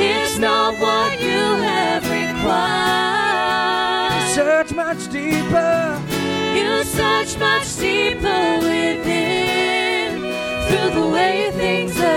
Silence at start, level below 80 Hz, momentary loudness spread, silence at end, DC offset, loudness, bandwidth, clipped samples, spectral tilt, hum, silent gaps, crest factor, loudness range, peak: 0 s; -42 dBFS; 4 LU; 0 s; under 0.1%; -18 LUFS; 17 kHz; under 0.1%; -3.5 dB/octave; none; none; 12 dB; 1 LU; -6 dBFS